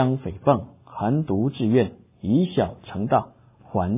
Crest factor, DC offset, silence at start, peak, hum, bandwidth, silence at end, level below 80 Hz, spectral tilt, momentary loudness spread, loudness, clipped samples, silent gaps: 18 dB; under 0.1%; 0 s; -6 dBFS; none; 3.8 kHz; 0 s; -46 dBFS; -12 dB/octave; 9 LU; -24 LUFS; under 0.1%; none